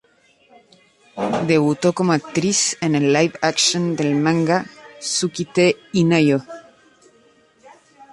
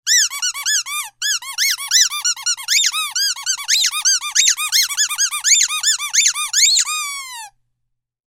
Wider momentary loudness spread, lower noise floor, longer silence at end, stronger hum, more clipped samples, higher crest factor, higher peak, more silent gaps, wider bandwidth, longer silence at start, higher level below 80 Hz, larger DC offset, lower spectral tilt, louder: about the same, 8 LU vs 8 LU; second, -56 dBFS vs -73 dBFS; second, 0.1 s vs 0.8 s; neither; neither; about the same, 18 dB vs 18 dB; about the same, -2 dBFS vs 0 dBFS; neither; second, 11.5 kHz vs 16.5 kHz; first, 1.15 s vs 0.05 s; first, -60 dBFS vs -70 dBFS; neither; first, -4.5 dB/octave vs 7.5 dB/octave; second, -18 LUFS vs -15 LUFS